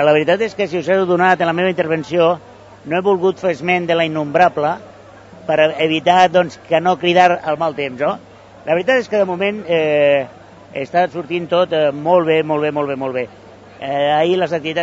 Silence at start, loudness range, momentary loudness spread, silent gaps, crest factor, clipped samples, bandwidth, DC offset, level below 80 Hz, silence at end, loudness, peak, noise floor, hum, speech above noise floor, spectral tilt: 0 s; 2 LU; 10 LU; none; 16 dB; under 0.1%; 8 kHz; under 0.1%; -60 dBFS; 0 s; -16 LUFS; 0 dBFS; -40 dBFS; none; 24 dB; -6 dB/octave